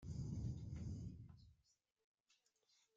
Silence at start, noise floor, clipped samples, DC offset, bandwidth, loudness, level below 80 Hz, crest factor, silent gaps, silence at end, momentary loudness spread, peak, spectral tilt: 0 s; -83 dBFS; under 0.1%; under 0.1%; 7.8 kHz; -50 LUFS; -62 dBFS; 16 dB; none; 1.4 s; 15 LU; -36 dBFS; -8 dB/octave